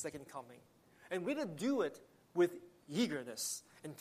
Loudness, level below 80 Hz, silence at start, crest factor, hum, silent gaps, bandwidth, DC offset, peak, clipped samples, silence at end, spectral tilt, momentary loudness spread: -39 LUFS; -82 dBFS; 0 s; 18 dB; none; none; 15 kHz; under 0.1%; -22 dBFS; under 0.1%; 0 s; -4 dB/octave; 16 LU